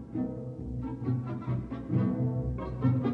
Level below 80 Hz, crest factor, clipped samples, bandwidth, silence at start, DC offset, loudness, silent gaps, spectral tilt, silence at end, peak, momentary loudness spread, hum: -46 dBFS; 16 dB; under 0.1%; 4.3 kHz; 0 s; under 0.1%; -33 LUFS; none; -11 dB/octave; 0 s; -16 dBFS; 8 LU; none